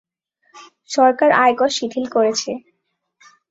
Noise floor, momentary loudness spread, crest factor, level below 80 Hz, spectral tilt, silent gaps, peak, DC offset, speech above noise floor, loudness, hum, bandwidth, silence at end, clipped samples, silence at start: -72 dBFS; 12 LU; 18 dB; -66 dBFS; -2.5 dB/octave; none; 0 dBFS; under 0.1%; 56 dB; -17 LUFS; none; 8 kHz; 0.9 s; under 0.1%; 0.55 s